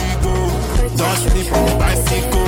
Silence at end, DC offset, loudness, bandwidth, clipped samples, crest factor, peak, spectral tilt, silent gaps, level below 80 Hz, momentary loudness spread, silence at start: 0 s; under 0.1%; -17 LUFS; 17 kHz; under 0.1%; 12 dB; -2 dBFS; -4.5 dB/octave; none; -18 dBFS; 3 LU; 0 s